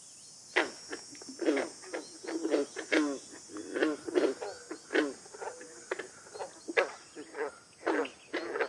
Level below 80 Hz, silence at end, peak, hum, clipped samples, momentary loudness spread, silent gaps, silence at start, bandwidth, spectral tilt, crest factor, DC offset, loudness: -82 dBFS; 0 s; -10 dBFS; none; under 0.1%; 14 LU; none; 0 s; 11.5 kHz; -2.5 dB/octave; 24 dB; under 0.1%; -35 LUFS